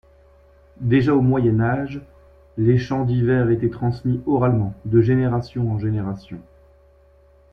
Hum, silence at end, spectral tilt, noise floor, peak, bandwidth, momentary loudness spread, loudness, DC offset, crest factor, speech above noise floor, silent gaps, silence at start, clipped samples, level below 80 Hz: none; 1.1 s; -10 dB/octave; -53 dBFS; -4 dBFS; 6.2 kHz; 13 LU; -20 LUFS; under 0.1%; 16 dB; 34 dB; none; 0.8 s; under 0.1%; -44 dBFS